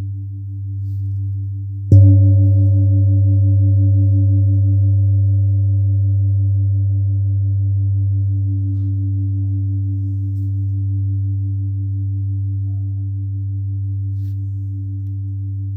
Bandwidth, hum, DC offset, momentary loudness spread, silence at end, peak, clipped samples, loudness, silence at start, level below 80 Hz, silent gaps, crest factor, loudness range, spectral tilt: 0.7 kHz; none; under 0.1%; 11 LU; 0 s; 0 dBFS; under 0.1%; -17 LUFS; 0 s; -48 dBFS; none; 16 dB; 9 LU; -14 dB/octave